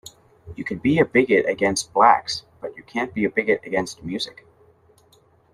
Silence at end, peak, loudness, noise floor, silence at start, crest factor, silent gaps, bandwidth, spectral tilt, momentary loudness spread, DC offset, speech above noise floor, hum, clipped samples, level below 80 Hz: 1.25 s; -2 dBFS; -21 LUFS; -57 dBFS; 0.45 s; 20 dB; none; 13 kHz; -4.5 dB/octave; 15 LU; under 0.1%; 36 dB; none; under 0.1%; -56 dBFS